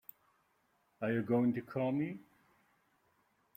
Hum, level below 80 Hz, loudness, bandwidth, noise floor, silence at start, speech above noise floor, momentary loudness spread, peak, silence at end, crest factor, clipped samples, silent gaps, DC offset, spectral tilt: none; -78 dBFS; -35 LUFS; 16 kHz; -76 dBFS; 1 s; 42 dB; 14 LU; -20 dBFS; 1.35 s; 18 dB; under 0.1%; none; under 0.1%; -9.5 dB/octave